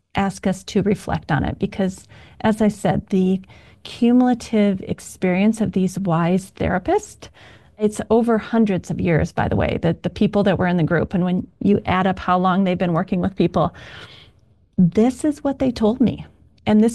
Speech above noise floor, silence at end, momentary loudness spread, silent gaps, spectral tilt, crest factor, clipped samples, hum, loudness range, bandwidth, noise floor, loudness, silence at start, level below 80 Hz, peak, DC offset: 36 dB; 0 s; 7 LU; none; -7 dB/octave; 12 dB; under 0.1%; none; 2 LU; 12.5 kHz; -55 dBFS; -20 LUFS; 0.15 s; -42 dBFS; -6 dBFS; 0.1%